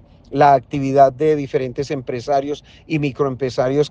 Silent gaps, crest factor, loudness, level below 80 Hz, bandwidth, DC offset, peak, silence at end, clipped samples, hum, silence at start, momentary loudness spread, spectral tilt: none; 16 dB; -18 LUFS; -50 dBFS; 8.2 kHz; under 0.1%; 0 dBFS; 0 s; under 0.1%; none; 0.3 s; 11 LU; -7 dB/octave